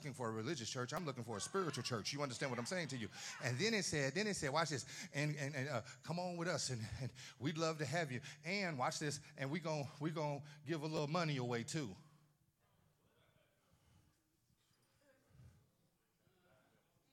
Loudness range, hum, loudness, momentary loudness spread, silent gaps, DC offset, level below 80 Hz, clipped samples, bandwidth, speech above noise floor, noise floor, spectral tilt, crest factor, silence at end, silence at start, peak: 4 LU; none; -42 LUFS; 7 LU; none; under 0.1%; -78 dBFS; under 0.1%; 16.5 kHz; 38 dB; -80 dBFS; -4.5 dB/octave; 22 dB; 1.65 s; 0 s; -22 dBFS